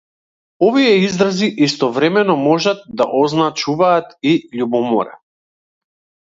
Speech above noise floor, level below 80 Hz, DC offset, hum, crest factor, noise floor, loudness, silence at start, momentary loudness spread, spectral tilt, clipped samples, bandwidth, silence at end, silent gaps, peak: over 75 dB; -60 dBFS; under 0.1%; none; 16 dB; under -90 dBFS; -15 LUFS; 0.6 s; 6 LU; -5.5 dB/octave; under 0.1%; 7.8 kHz; 1.2 s; none; 0 dBFS